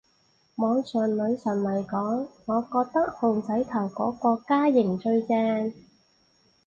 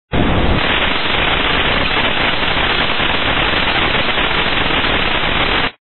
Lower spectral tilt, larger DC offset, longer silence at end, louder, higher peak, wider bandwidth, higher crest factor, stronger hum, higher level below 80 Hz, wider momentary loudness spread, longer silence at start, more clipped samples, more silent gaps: first, -8 dB/octave vs -1.5 dB/octave; second, under 0.1% vs 7%; first, 0.95 s vs 0.15 s; second, -26 LUFS vs -14 LUFS; second, -10 dBFS vs -2 dBFS; first, 7.2 kHz vs 4.4 kHz; about the same, 16 dB vs 14 dB; neither; second, -66 dBFS vs -26 dBFS; first, 6 LU vs 1 LU; first, 0.6 s vs 0.1 s; neither; neither